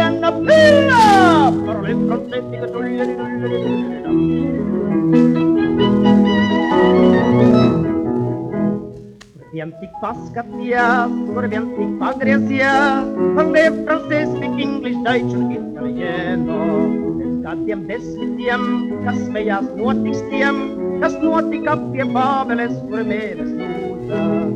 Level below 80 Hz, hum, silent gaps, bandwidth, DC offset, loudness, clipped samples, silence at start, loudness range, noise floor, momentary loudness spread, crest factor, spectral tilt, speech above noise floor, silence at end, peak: -48 dBFS; none; none; 11.5 kHz; under 0.1%; -17 LUFS; under 0.1%; 0 s; 7 LU; -40 dBFS; 12 LU; 16 dB; -7 dB/octave; 22 dB; 0 s; 0 dBFS